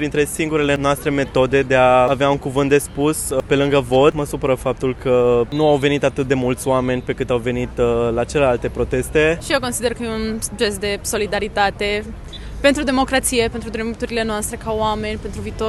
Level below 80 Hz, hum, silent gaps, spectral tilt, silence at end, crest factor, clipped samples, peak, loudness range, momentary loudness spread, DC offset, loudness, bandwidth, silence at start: -34 dBFS; none; none; -4.5 dB/octave; 0 s; 16 dB; under 0.1%; -2 dBFS; 4 LU; 8 LU; under 0.1%; -18 LUFS; 13 kHz; 0 s